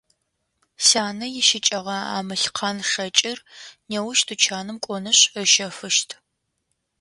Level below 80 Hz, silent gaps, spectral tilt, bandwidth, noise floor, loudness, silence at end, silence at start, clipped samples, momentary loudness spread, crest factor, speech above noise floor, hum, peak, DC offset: -68 dBFS; none; -0.5 dB/octave; 11.5 kHz; -76 dBFS; -20 LUFS; 0.85 s; 0.8 s; under 0.1%; 14 LU; 24 dB; 54 dB; none; 0 dBFS; under 0.1%